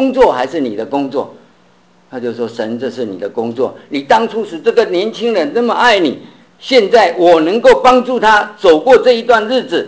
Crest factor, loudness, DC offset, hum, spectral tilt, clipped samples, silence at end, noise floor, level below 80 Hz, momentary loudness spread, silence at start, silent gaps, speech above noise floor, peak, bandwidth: 12 dB; -12 LUFS; 0.2%; none; -4.5 dB/octave; under 0.1%; 0 s; -49 dBFS; -48 dBFS; 12 LU; 0 s; none; 38 dB; 0 dBFS; 8 kHz